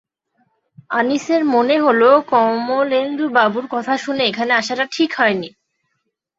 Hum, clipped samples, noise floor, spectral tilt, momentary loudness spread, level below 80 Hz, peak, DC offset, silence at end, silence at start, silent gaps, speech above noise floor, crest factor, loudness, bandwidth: none; under 0.1%; -73 dBFS; -4 dB/octave; 8 LU; -66 dBFS; -2 dBFS; under 0.1%; 0.9 s; 0.9 s; none; 56 dB; 16 dB; -16 LUFS; 7.8 kHz